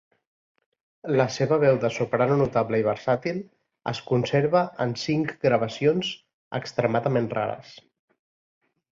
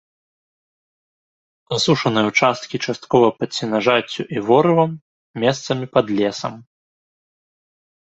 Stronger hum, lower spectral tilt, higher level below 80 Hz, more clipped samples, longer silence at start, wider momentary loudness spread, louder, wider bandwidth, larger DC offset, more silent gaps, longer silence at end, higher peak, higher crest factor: neither; first, -6.5 dB/octave vs -5 dB/octave; about the same, -60 dBFS vs -60 dBFS; neither; second, 1.05 s vs 1.7 s; about the same, 11 LU vs 10 LU; second, -24 LUFS vs -18 LUFS; about the same, 7.6 kHz vs 8.2 kHz; neither; second, 6.34-6.51 s vs 5.01-5.34 s; second, 1.2 s vs 1.55 s; second, -6 dBFS vs -2 dBFS; about the same, 18 dB vs 18 dB